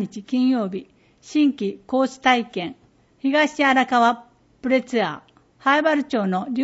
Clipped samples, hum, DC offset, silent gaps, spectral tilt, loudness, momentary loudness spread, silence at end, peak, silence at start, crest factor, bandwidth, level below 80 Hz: under 0.1%; none; under 0.1%; none; -5 dB/octave; -21 LUFS; 12 LU; 0 s; -4 dBFS; 0 s; 18 dB; 8 kHz; -64 dBFS